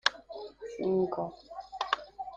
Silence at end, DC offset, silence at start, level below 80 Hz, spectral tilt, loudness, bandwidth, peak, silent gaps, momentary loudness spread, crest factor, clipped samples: 0 s; under 0.1%; 0.05 s; -66 dBFS; -4 dB/octave; -34 LUFS; 8.8 kHz; -6 dBFS; none; 15 LU; 28 dB; under 0.1%